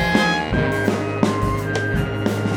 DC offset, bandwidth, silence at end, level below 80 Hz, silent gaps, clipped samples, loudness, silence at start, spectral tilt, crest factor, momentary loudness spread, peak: under 0.1%; 17.5 kHz; 0 s; -34 dBFS; none; under 0.1%; -20 LUFS; 0 s; -6 dB/octave; 18 dB; 4 LU; -2 dBFS